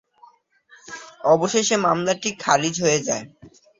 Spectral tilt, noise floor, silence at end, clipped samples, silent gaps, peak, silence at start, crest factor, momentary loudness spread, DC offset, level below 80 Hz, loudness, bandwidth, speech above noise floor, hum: -3 dB/octave; -54 dBFS; 0.3 s; under 0.1%; none; 0 dBFS; 0.85 s; 22 dB; 15 LU; under 0.1%; -64 dBFS; -20 LUFS; 7.8 kHz; 34 dB; none